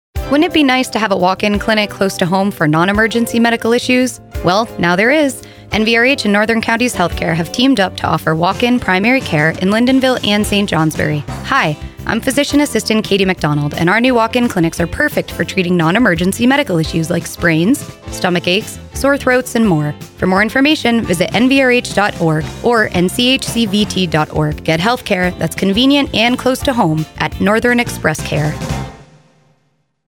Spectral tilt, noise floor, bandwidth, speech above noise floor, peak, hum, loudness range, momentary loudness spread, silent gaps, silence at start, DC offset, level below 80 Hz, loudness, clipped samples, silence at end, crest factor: -5 dB/octave; -62 dBFS; 18.5 kHz; 48 dB; 0 dBFS; none; 2 LU; 6 LU; none; 0.15 s; under 0.1%; -36 dBFS; -14 LUFS; under 0.1%; 1.05 s; 14 dB